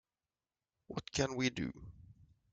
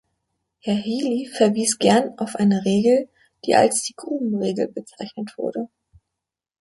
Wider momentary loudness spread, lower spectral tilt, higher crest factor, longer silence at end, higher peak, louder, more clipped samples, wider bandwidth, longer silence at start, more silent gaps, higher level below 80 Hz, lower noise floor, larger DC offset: first, 18 LU vs 15 LU; about the same, -4.5 dB/octave vs -4.5 dB/octave; about the same, 24 dB vs 20 dB; second, 0.4 s vs 0.95 s; second, -18 dBFS vs -2 dBFS; second, -38 LUFS vs -21 LUFS; neither; second, 9.4 kHz vs 11.5 kHz; first, 0.9 s vs 0.65 s; neither; about the same, -62 dBFS vs -64 dBFS; first, under -90 dBFS vs -84 dBFS; neither